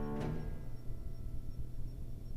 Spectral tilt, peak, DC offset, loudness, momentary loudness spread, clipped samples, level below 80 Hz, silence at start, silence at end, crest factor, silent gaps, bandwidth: -8 dB/octave; -26 dBFS; under 0.1%; -46 LUFS; 8 LU; under 0.1%; -42 dBFS; 0 s; 0 s; 12 dB; none; 14.5 kHz